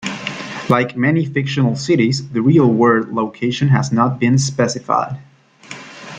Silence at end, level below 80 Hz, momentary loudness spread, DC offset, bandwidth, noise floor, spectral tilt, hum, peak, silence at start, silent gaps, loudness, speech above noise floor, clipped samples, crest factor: 0 s; -54 dBFS; 14 LU; under 0.1%; 9.2 kHz; -38 dBFS; -6 dB/octave; none; -2 dBFS; 0 s; none; -16 LUFS; 23 dB; under 0.1%; 16 dB